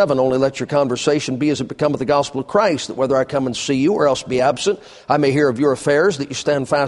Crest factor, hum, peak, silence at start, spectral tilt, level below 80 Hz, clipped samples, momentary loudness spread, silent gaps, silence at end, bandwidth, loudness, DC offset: 16 dB; none; -2 dBFS; 0 s; -5 dB/octave; -54 dBFS; under 0.1%; 5 LU; none; 0 s; 11.5 kHz; -18 LUFS; under 0.1%